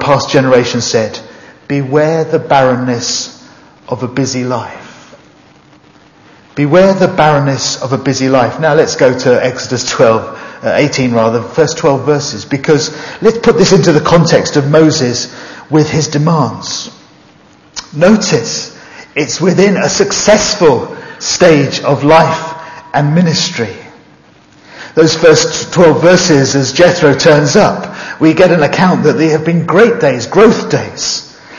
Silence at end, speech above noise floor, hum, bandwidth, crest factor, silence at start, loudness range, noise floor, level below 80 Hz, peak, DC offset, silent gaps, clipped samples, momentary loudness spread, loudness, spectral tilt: 0 s; 33 dB; none; 7.8 kHz; 10 dB; 0 s; 6 LU; -42 dBFS; -44 dBFS; 0 dBFS; under 0.1%; none; 0.8%; 12 LU; -10 LUFS; -4.5 dB/octave